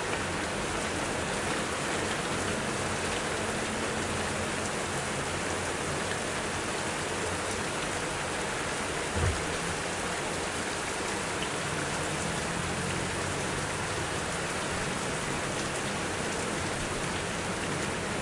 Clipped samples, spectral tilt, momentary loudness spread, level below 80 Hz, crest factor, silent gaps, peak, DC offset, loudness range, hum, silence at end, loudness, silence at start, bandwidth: under 0.1%; -3 dB/octave; 1 LU; -50 dBFS; 16 dB; none; -14 dBFS; under 0.1%; 1 LU; none; 0 s; -31 LUFS; 0 s; 11.5 kHz